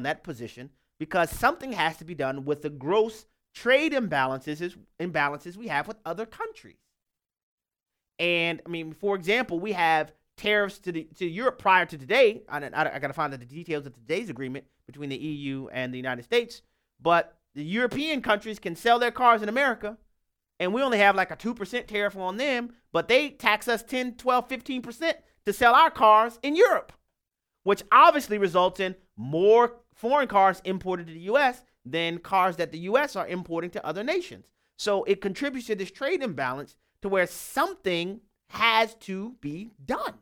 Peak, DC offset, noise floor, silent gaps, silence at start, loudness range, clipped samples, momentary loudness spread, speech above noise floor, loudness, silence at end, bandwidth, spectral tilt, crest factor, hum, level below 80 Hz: -4 dBFS; under 0.1%; -87 dBFS; 7.43-7.58 s; 0 s; 9 LU; under 0.1%; 15 LU; 61 dB; -25 LUFS; 0.1 s; 18 kHz; -4.5 dB/octave; 22 dB; none; -60 dBFS